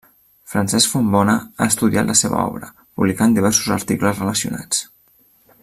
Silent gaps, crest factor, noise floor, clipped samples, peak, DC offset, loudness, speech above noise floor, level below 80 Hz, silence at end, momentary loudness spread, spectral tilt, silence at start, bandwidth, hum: none; 18 dB; -55 dBFS; under 0.1%; 0 dBFS; under 0.1%; -17 LUFS; 38 dB; -52 dBFS; 0.8 s; 7 LU; -3.5 dB/octave; 0.5 s; 15.5 kHz; none